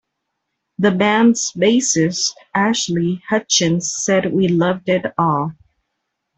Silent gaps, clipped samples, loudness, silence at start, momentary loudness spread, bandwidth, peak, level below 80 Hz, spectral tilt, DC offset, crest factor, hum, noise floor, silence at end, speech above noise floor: none; under 0.1%; -17 LUFS; 0.8 s; 6 LU; 8.4 kHz; -2 dBFS; -58 dBFS; -4 dB/octave; under 0.1%; 16 dB; none; -76 dBFS; 0.85 s; 59 dB